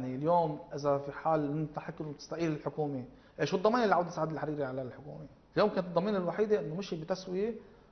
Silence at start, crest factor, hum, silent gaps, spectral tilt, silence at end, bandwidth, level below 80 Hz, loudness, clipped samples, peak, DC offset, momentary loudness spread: 0 s; 20 dB; none; none; -7 dB/octave; 0.3 s; 6.4 kHz; -64 dBFS; -33 LUFS; under 0.1%; -12 dBFS; under 0.1%; 13 LU